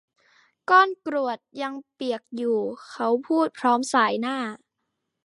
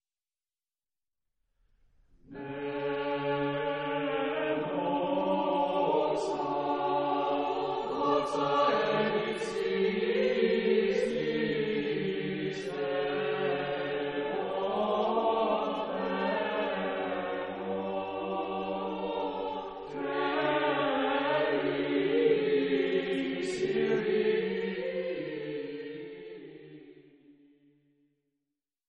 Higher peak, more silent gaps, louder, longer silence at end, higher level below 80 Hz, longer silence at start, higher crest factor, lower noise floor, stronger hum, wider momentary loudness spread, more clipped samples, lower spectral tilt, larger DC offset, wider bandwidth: first, -4 dBFS vs -14 dBFS; neither; first, -24 LUFS vs -30 LUFS; second, 0.7 s vs 1.6 s; second, -82 dBFS vs -66 dBFS; second, 0.7 s vs 2.3 s; about the same, 20 dB vs 16 dB; second, -80 dBFS vs under -90 dBFS; neither; first, 14 LU vs 9 LU; neither; second, -3.5 dB/octave vs -6 dB/octave; neither; first, 11.5 kHz vs 8.2 kHz